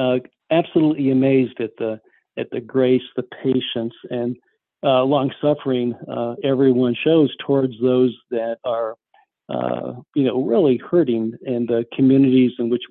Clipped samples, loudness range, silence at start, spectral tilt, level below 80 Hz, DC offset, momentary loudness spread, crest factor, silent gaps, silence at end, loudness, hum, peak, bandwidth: under 0.1%; 3 LU; 0 s; -11 dB/octave; -64 dBFS; under 0.1%; 11 LU; 16 dB; none; 0.05 s; -20 LUFS; none; -4 dBFS; 4.2 kHz